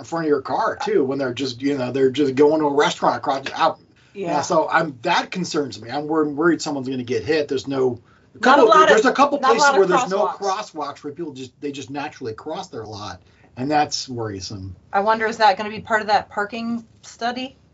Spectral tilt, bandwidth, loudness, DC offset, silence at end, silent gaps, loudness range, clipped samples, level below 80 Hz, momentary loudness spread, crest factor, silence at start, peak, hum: -3 dB/octave; 8 kHz; -20 LUFS; under 0.1%; 0.25 s; none; 11 LU; under 0.1%; -60 dBFS; 16 LU; 20 dB; 0 s; 0 dBFS; none